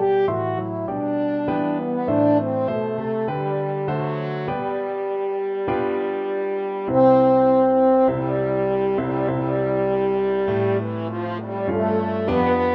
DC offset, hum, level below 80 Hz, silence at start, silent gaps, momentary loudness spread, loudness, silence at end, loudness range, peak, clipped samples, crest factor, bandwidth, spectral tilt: under 0.1%; none; -52 dBFS; 0 s; none; 9 LU; -22 LUFS; 0 s; 6 LU; -6 dBFS; under 0.1%; 16 dB; 5.4 kHz; -10.5 dB/octave